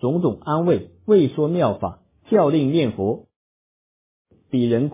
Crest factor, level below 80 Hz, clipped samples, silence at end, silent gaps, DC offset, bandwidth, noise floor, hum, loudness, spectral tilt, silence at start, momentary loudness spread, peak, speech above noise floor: 16 dB; -52 dBFS; under 0.1%; 0 s; 3.36-4.25 s; under 0.1%; 3.8 kHz; under -90 dBFS; none; -20 LUFS; -12 dB/octave; 0.05 s; 9 LU; -4 dBFS; over 71 dB